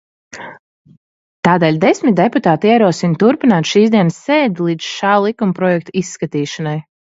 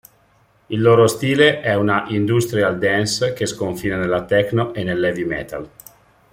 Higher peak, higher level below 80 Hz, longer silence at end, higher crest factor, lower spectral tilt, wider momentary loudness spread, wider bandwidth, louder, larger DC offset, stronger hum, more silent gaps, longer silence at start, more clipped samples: about the same, 0 dBFS vs -2 dBFS; second, -60 dBFS vs -50 dBFS; second, 0.3 s vs 0.65 s; about the same, 14 dB vs 16 dB; about the same, -6 dB/octave vs -5 dB/octave; about the same, 10 LU vs 10 LU; second, 8 kHz vs 16.5 kHz; first, -14 LUFS vs -18 LUFS; neither; neither; first, 0.59-0.85 s, 0.97-1.43 s vs none; second, 0.35 s vs 0.7 s; neither